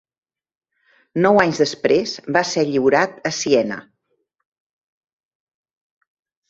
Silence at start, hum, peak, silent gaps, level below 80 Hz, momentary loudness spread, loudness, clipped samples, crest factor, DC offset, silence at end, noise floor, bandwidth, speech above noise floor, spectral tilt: 1.15 s; none; 0 dBFS; none; -60 dBFS; 9 LU; -18 LUFS; under 0.1%; 22 dB; under 0.1%; 2.7 s; -71 dBFS; 8 kHz; 54 dB; -4.5 dB/octave